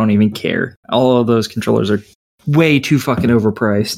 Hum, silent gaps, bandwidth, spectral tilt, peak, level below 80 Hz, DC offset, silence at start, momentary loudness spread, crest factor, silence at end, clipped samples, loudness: none; 0.76-0.83 s, 2.15-2.38 s; 16 kHz; -6.5 dB/octave; 0 dBFS; -50 dBFS; under 0.1%; 0 s; 7 LU; 14 dB; 0 s; under 0.1%; -15 LUFS